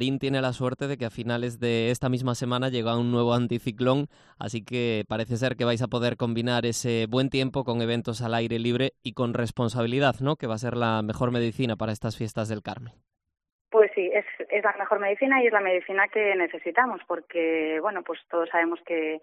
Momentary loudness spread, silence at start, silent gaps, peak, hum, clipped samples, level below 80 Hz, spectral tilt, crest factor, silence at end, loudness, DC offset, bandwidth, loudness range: 8 LU; 0 s; 13.52-13.65 s; -6 dBFS; none; under 0.1%; -58 dBFS; -6 dB/octave; 20 dB; 0.05 s; -26 LUFS; under 0.1%; 13 kHz; 4 LU